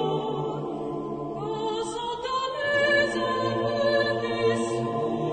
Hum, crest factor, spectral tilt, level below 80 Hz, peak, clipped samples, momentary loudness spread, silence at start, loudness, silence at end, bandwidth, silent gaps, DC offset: none; 16 dB; -5 dB/octave; -58 dBFS; -10 dBFS; under 0.1%; 10 LU; 0 s; -26 LUFS; 0 s; 9.4 kHz; none; under 0.1%